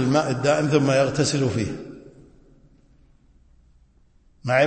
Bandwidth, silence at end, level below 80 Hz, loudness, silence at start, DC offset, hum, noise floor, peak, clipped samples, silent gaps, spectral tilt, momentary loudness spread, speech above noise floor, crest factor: 8.8 kHz; 0 s; -54 dBFS; -21 LUFS; 0 s; under 0.1%; none; -57 dBFS; -6 dBFS; under 0.1%; none; -5.5 dB/octave; 17 LU; 36 dB; 18 dB